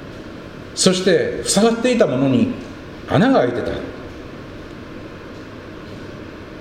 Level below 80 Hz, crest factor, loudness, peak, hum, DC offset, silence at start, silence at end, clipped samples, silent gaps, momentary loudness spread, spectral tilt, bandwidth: -44 dBFS; 20 dB; -17 LUFS; 0 dBFS; none; under 0.1%; 0 s; 0 s; under 0.1%; none; 20 LU; -4.5 dB/octave; 16 kHz